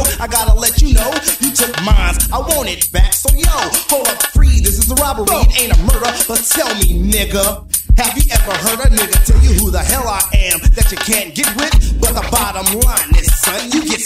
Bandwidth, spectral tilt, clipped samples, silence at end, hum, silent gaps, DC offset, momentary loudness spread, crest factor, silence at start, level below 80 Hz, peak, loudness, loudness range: 16.5 kHz; -3 dB/octave; under 0.1%; 0 s; none; none; under 0.1%; 3 LU; 12 dB; 0 s; -14 dBFS; 0 dBFS; -13 LUFS; 1 LU